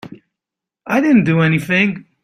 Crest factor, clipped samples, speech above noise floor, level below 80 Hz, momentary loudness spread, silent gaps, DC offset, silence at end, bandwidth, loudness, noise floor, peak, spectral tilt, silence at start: 14 dB; under 0.1%; 71 dB; -54 dBFS; 6 LU; none; under 0.1%; 0.2 s; 15 kHz; -15 LUFS; -85 dBFS; -2 dBFS; -7 dB/octave; 0.05 s